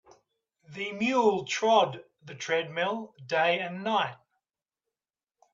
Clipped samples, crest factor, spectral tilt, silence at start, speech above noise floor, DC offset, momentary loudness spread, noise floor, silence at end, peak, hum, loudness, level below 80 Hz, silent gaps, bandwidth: under 0.1%; 20 dB; -4 dB/octave; 0.7 s; over 62 dB; under 0.1%; 14 LU; under -90 dBFS; 1.4 s; -10 dBFS; none; -28 LUFS; -76 dBFS; none; 7.6 kHz